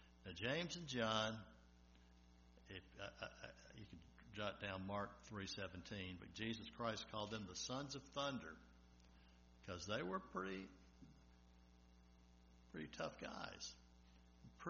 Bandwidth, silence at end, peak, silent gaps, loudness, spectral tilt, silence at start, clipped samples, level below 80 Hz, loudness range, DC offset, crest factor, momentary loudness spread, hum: 7 kHz; 0 s; -26 dBFS; none; -49 LUFS; -3 dB/octave; 0 s; under 0.1%; -70 dBFS; 7 LU; under 0.1%; 26 dB; 24 LU; 60 Hz at -70 dBFS